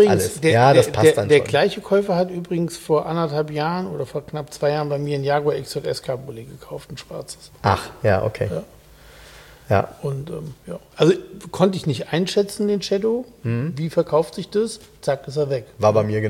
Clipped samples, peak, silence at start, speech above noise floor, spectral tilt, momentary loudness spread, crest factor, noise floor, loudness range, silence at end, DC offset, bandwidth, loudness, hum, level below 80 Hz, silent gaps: under 0.1%; -2 dBFS; 0 s; 25 dB; -6 dB/octave; 17 LU; 20 dB; -46 dBFS; 7 LU; 0 s; under 0.1%; 16.5 kHz; -21 LUFS; none; -52 dBFS; none